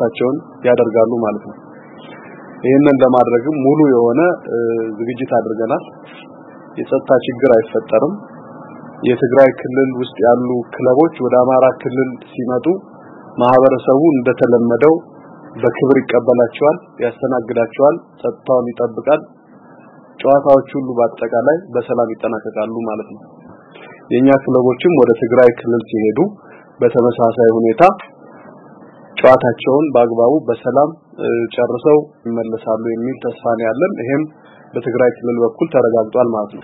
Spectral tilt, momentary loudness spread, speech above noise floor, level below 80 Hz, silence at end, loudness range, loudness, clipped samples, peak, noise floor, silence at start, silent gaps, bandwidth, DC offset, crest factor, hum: -9.5 dB/octave; 11 LU; 28 dB; -58 dBFS; 0.05 s; 4 LU; -14 LUFS; under 0.1%; 0 dBFS; -42 dBFS; 0 s; none; 4.9 kHz; under 0.1%; 14 dB; none